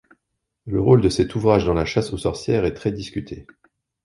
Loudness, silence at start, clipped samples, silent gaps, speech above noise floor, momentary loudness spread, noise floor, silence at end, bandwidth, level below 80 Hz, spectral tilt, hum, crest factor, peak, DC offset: -20 LUFS; 0.65 s; under 0.1%; none; 58 dB; 15 LU; -78 dBFS; 0.65 s; 11.5 kHz; -40 dBFS; -7 dB/octave; none; 20 dB; -2 dBFS; under 0.1%